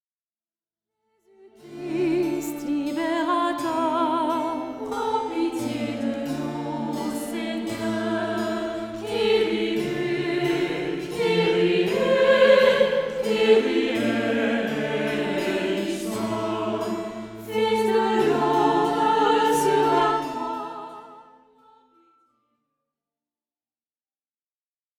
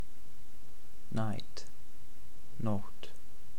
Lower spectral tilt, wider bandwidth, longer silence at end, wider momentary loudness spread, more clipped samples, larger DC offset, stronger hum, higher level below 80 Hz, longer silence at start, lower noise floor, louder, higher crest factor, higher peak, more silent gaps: second, -5 dB/octave vs -6.5 dB/octave; about the same, 18.5 kHz vs 19 kHz; first, 3.75 s vs 0 s; second, 10 LU vs 22 LU; neither; second, under 0.1% vs 4%; neither; about the same, -60 dBFS vs -60 dBFS; first, 1.45 s vs 0 s; first, under -90 dBFS vs -57 dBFS; first, -23 LUFS vs -41 LUFS; about the same, 18 dB vs 22 dB; first, -6 dBFS vs -18 dBFS; neither